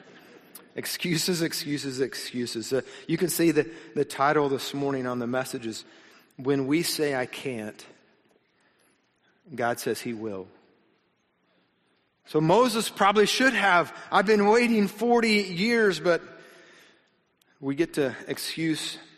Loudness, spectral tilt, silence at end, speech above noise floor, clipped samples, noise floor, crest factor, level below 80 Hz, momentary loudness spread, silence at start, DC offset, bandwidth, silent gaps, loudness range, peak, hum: -25 LUFS; -4 dB/octave; 0.15 s; 45 dB; under 0.1%; -70 dBFS; 20 dB; -66 dBFS; 13 LU; 0.35 s; under 0.1%; 15 kHz; none; 13 LU; -8 dBFS; none